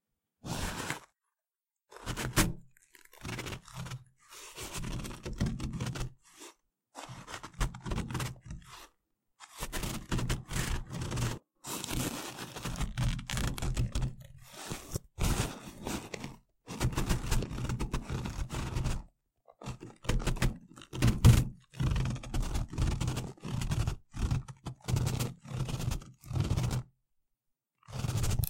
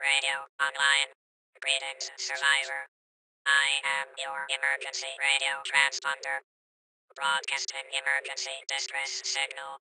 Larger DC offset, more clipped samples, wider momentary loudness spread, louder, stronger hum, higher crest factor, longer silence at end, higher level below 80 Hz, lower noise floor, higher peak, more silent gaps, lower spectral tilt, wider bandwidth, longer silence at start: neither; neither; first, 15 LU vs 11 LU; second, -35 LUFS vs -28 LUFS; neither; about the same, 26 dB vs 24 dB; about the same, 0 s vs 0.05 s; first, -40 dBFS vs -86 dBFS; about the same, under -90 dBFS vs under -90 dBFS; about the same, -10 dBFS vs -8 dBFS; second, none vs 0.49-0.59 s, 1.15-1.53 s, 2.88-3.45 s, 6.44-7.08 s; first, -5 dB/octave vs 3 dB/octave; first, 16.5 kHz vs 12.5 kHz; first, 0.45 s vs 0 s